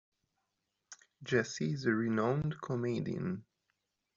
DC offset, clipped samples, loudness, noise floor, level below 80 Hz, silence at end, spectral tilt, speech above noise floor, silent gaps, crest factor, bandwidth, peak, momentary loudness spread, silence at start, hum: under 0.1%; under 0.1%; -35 LUFS; -85 dBFS; -68 dBFS; 0.75 s; -6 dB/octave; 51 dB; none; 20 dB; 7.6 kHz; -16 dBFS; 15 LU; 0.9 s; none